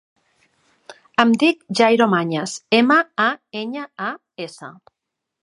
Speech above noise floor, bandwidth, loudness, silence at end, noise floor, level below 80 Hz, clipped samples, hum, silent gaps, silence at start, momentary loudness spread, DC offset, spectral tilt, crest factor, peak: 44 dB; 11.5 kHz; -18 LUFS; 0.7 s; -63 dBFS; -70 dBFS; under 0.1%; none; none; 0.9 s; 18 LU; under 0.1%; -4.5 dB/octave; 20 dB; 0 dBFS